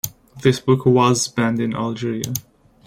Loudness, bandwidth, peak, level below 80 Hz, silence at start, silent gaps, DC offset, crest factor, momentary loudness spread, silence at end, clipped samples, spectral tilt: -19 LUFS; 16.5 kHz; -2 dBFS; -54 dBFS; 0.05 s; none; under 0.1%; 18 dB; 11 LU; 0.45 s; under 0.1%; -5.5 dB/octave